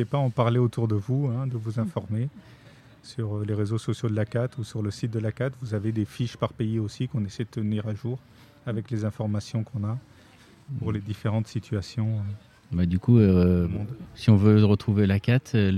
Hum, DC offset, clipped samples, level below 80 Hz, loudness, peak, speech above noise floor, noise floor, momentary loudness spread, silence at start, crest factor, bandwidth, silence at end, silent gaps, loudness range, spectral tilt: none; under 0.1%; under 0.1%; -50 dBFS; -26 LUFS; -6 dBFS; 28 dB; -53 dBFS; 13 LU; 0 s; 20 dB; 10 kHz; 0 s; none; 9 LU; -8 dB/octave